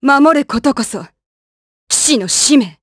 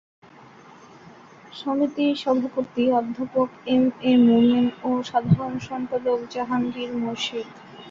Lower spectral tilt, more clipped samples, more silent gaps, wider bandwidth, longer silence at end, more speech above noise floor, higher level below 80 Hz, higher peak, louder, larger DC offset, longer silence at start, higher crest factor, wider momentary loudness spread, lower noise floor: second, -2 dB/octave vs -7 dB/octave; neither; first, 1.26-1.87 s vs none; first, 11 kHz vs 7.4 kHz; about the same, 0.1 s vs 0 s; first, over 78 dB vs 26 dB; first, -48 dBFS vs -60 dBFS; first, 0 dBFS vs -6 dBFS; first, -12 LUFS vs -23 LUFS; neither; second, 0 s vs 1.05 s; about the same, 14 dB vs 16 dB; about the same, 10 LU vs 11 LU; first, under -90 dBFS vs -48 dBFS